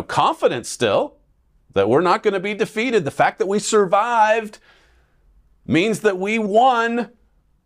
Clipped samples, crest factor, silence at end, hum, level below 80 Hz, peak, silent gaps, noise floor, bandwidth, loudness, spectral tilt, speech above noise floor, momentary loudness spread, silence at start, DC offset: under 0.1%; 14 dB; 0.6 s; none; -58 dBFS; -4 dBFS; none; -59 dBFS; 15 kHz; -19 LUFS; -4.5 dB/octave; 41 dB; 7 LU; 0 s; under 0.1%